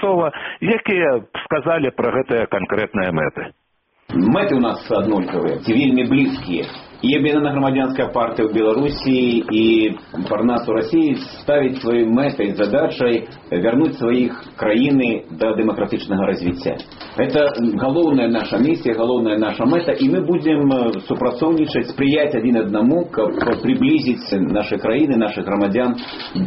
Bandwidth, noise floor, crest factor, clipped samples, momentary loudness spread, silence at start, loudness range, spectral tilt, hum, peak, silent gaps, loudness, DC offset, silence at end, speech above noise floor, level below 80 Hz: 5.8 kHz; -62 dBFS; 14 dB; under 0.1%; 7 LU; 0 s; 2 LU; -5 dB/octave; none; -4 dBFS; none; -18 LUFS; under 0.1%; 0 s; 45 dB; -48 dBFS